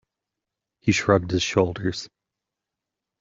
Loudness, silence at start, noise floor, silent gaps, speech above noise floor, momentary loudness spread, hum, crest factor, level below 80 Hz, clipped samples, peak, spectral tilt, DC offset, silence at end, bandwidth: -23 LUFS; 0.85 s; -86 dBFS; none; 64 dB; 12 LU; none; 22 dB; -54 dBFS; under 0.1%; -4 dBFS; -5 dB/octave; under 0.1%; 1.15 s; 7.8 kHz